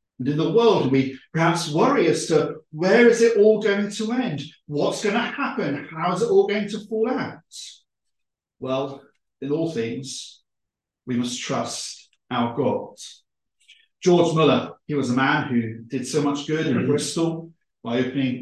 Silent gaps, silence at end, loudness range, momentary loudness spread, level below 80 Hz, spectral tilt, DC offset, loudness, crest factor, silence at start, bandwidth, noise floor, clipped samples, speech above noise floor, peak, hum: none; 0 s; 10 LU; 16 LU; -66 dBFS; -5.5 dB/octave; under 0.1%; -22 LUFS; 18 dB; 0.2 s; 12.5 kHz; -83 dBFS; under 0.1%; 62 dB; -4 dBFS; none